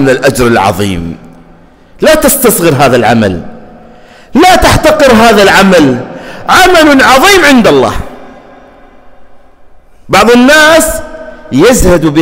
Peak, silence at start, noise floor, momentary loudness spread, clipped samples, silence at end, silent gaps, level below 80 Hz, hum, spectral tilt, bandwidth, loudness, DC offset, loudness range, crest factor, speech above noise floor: 0 dBFS; 0 s; -37 dBFS; 15 LU; 0.5%; 0 s; none; -24 dBFS; none; -4 dB/octave; 16.5 kHz; -5 LUFS; under 0.1%; 5 LU; 6 dB; 33 dB